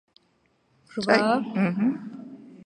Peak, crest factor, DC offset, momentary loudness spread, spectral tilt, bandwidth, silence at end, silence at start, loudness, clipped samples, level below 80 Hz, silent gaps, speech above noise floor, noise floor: -4 dBFS; 22 dB; under 0.1%; 20 LU; -6.5 dB/octave; 9.6 kHz; 0.1 s; 0.95 s; -24 LUFS; under 0.1%; -72 dBFS; none; 44 dB; -67 dBFS